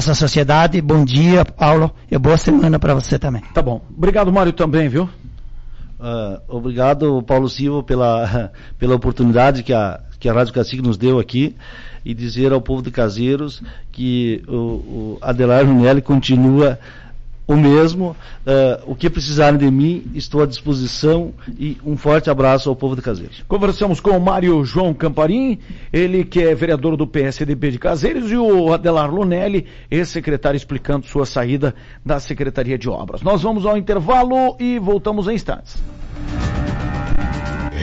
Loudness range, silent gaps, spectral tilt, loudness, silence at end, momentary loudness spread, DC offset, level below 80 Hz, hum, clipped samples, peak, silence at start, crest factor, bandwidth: 5 LU; none; -7 dB/octave; -16 LUFS; 0 s; 12 LU; under 0.1%; -30 dBFS; none; under 0.1%; -4 dBFS; 0 s; 10 dB; 8 kHz